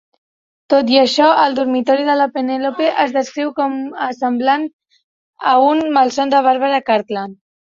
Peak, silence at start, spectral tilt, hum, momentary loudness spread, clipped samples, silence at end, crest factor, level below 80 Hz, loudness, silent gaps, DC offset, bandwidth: 0 dBFS; 0.7 s; -4 dB/octave; none; 10 LU; under 0.1%; 0.4 s; 14 dB; -64 dBFS; -15 LUFS; 4.73-4.79 s, 5.04-5.33 s; under 0.1%; 7.8 kHz